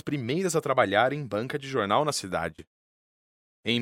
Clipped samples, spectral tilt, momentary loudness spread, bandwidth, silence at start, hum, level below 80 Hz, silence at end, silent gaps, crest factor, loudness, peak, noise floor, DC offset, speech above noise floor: under 0.1%; -4.5 dB/octave; 9 LU; 16 kHz; 0.05 s; none; -62 dBFS; 0 s; 2.67-3.63 s; 22 dB; -27 LUFS; -8 dBFS; under -90 dBFS; under 0.1%; over 63 dB